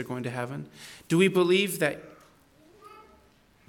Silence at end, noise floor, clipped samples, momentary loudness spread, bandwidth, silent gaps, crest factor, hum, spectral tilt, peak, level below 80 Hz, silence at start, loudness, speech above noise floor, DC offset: 0.65 s; -60 dBFS; under 0.1%; 20 LU; 19 kHz; none; 20 dB; none; -5 dB/octave; -10 dBFS; -68 dBFS; 0 s; -26 LUFS; 34 dB; under 0.1%